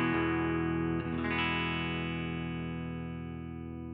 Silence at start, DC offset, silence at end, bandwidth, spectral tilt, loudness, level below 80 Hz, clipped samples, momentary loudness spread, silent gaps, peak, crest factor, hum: 0 s; under 0.1%; 0 s; 4.9 kHz; -10 dB/octave; -34 LUFS; -54 dBFS; under 0.1%; 11 LU; none; -18 dBFS; 16 dB; none